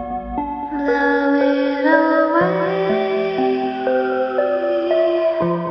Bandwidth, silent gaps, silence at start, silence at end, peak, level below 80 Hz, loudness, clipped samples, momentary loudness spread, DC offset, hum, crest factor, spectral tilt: 6.2 kHz; none; 0 s; 0 s; -2 dBFS; -46 dBFS; -18 LUFS; under 0.1%; 7 LU; under 0.1%; none; 14 dB; -8 dB/octave